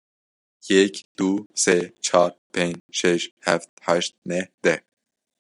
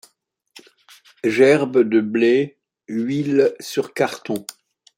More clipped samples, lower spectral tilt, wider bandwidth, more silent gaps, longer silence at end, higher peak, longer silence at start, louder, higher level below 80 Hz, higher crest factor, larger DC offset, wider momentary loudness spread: neither; second, -3.5 dB/octave vs -5.5 dB/octave; second, 11.5 kHz vs 16.5 kHz; first, 1.05-1.15 s, 1.46-1.50 s, 2.38-2.50 s, 2.80-2.89 s, 3.31-3.37 s, 3.69-3.77 s, 4.18-4.22 s, 4.54-4.58 s vs none; first, 0.65 s vs 0.45 s; about the same, -2 dBFS vs -2 dBFS; second, 0.65 s vs 1.25 s; second, -22 LUFS vs -19 LUFS; about the same, -70 dBFS vs -68 dBFS; about the same, 22 dB vs 18 dB; neither; second, 7 LU vs 14 LU